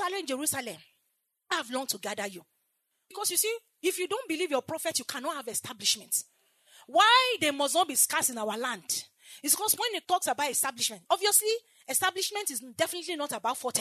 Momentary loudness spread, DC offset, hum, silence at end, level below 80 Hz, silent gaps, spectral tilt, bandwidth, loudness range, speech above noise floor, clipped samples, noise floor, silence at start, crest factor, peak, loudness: 11 LU; under 0.1%; none; 0 s; -86 dBFS; none; -0.5 dB/octave; 13.5 kHz; 7 LU; 49 dB; under 0.1%; -78 dBFS; 0 s; 22 dB; -8 dBFS; -28 LUFS